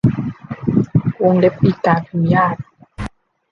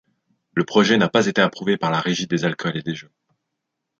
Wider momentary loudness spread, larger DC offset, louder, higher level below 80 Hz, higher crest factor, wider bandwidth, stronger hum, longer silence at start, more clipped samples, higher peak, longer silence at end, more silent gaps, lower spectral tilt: first, 17 LU vs 11 LU; neither; first, -16 LUFS vs -20 LUFS; first, -42 dBFS vs -64 dBFS; about the same, 16 dB vs 20 dB; second, 7 kHz vs 7.8 kHz; neither; second, 0.05 s vs 0.55 s; neither; about the same, -2 dBFS vs -2 dBFS; second, 0.45 s vs 0.95 s; neither; first, -9.5 dB/octave vs -5 dB/octave